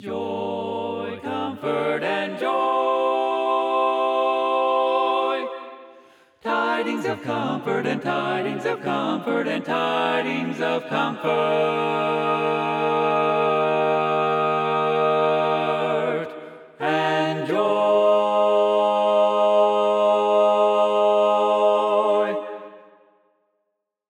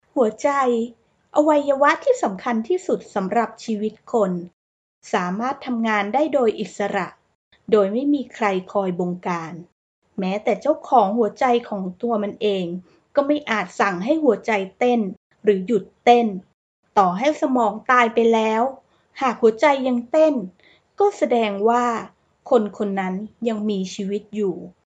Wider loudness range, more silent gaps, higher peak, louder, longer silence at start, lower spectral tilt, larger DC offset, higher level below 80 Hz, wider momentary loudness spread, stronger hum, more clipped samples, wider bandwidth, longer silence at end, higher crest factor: about the same, 6 LU vs 5 LU; second, none vs 4.53-5.02 s, 7.35-7.51 s, 9.72-10.02 s, 15.17-15.30 s, 16.54-16.83 s; second, -8 dBFS vs -2 dBFS; about the same, -21 LUFS vs -21 LUFS; second, 0 s vs 0.15 s; about the same, -6 dB/octave vs -6 dB/octave; neither; second, -80 dBFS vs -66 dBFS; about the same, 9 LU vs 9 LU; neither; neither; first, 11 kHz vs 8.8 kHz; first, 1.3 s vs 0.15 s; second, 14 dB vs 20 dB